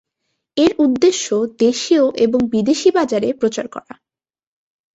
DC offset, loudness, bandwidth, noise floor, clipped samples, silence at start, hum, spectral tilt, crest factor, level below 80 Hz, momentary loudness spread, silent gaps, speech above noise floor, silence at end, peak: under 0.1%; -16 LUFS; 8 kHz; -74 dBFS; under 0.1%; 0.55 s; none; -4 dB/octave; 16 dB; -54 dBFS; 9 LU; none; 58 dB; 1.15 s; -2 dBFS